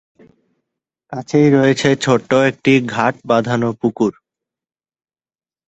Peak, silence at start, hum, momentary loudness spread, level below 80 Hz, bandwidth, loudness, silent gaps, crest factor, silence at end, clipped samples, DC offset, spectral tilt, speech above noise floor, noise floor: 0 dBFS; 1.1 s; none; 8 LU; -56 dBFS; 8.2 kHz; -15 LUFS; none; 16 dB; 1.55 s; under 0.1%; under 0.1%; -6 dB/octave; over 75 dB; under -90 dBFS